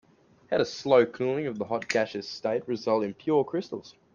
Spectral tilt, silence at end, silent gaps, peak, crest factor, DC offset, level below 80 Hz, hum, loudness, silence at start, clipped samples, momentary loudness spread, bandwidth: -5.5 dB/octave; 0.25 s; none; -8 dBFS; 20 dB; under 0.1%; -70 dBFS; none; -27 LUFS; 0.5 s; under 0.1%; 10 LU; 7.4 kHz